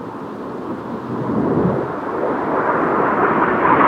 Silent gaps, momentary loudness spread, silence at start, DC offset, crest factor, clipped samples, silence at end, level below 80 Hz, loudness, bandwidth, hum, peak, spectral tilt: none; 12 LU; 0 s; under 0.1%; 16 dB; under 0.1%; 0 s; -48 dBFS; -19 LUFS; 9.6 kHz; none; -2 dBFS; -8.5 dB/octave